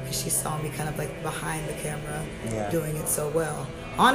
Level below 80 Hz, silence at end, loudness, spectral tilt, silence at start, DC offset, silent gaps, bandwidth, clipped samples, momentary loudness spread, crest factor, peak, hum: -46 dBFS; 0 s; -29 LUFS; -4 dB/octave; 0 s; under 0.1%; none; 15.5 kHz; under 0.1%; 7 LU; 24 dB; -4 dBFS; none